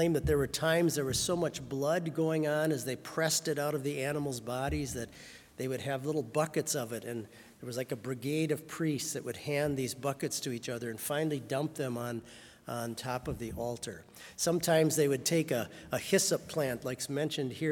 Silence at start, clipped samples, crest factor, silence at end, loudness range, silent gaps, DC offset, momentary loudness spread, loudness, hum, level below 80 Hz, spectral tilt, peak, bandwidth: 0 s; under 0.1%; 20 dB; 0 s; 5 LU; none; under 0.1%; 12 LU; -33 LUFS; none; -56 dBFS; -4.5 dB/octave; -12 dBFS; 18 kHz